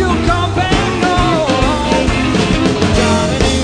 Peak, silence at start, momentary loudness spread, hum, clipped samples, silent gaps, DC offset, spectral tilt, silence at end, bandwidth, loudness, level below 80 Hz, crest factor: 0 dBFS; 0 s; 1 LU; none; under 0.1%; none; under 0.1%; -5 dB/octave; 0 s; 10.5 kHz; -13 LUFS; -22 dBFS; 12 dB